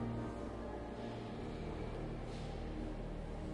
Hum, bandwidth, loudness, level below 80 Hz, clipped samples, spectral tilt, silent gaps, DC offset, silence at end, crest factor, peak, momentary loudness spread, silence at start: none; 11 kHz; -45 LUFS; -50 dBFS; under 0.1%; -7.5 dB/octave; none; under 0.1%; 0 s; 12 dB; -32 dBFS; 2 LU; 0 s